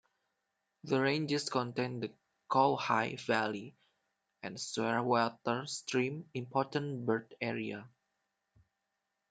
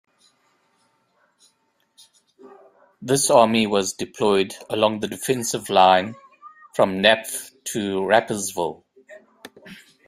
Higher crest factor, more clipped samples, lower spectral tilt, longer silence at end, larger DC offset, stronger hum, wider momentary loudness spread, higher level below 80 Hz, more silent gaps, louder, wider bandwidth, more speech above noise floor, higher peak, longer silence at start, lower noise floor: about the same, 22 dB vs 22 dB; neither; first, -5 dB/octave vs -3 dB/octave; first, 1.45 s vs 0.35 s; neither; neither; about the same, 13 LU vs 14 LU; second, -80 dBFS vs -64 dBFS; neither; second, -34 LUFS vs -20 LUFS; second, 9.4 kHz vs 16 kHz; first, 51 dB vs 47 dB; second, -14 dBFS vs 0 dBFS; second, 0.85 s vs 2.45 s; first, -85 dBFS vs -67 dBFS